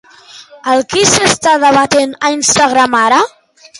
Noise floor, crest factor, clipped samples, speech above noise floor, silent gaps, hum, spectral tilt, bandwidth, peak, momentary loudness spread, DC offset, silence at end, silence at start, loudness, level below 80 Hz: -37 dBFS; 12 dB; under 0.1%; 27 dB; none; none; -2 dB/octave; 16 kHz; 0 dBFS; 6 LU; under 0.1%; 0.5 s; 0.35 s; -10 LUFS; -46 dBFS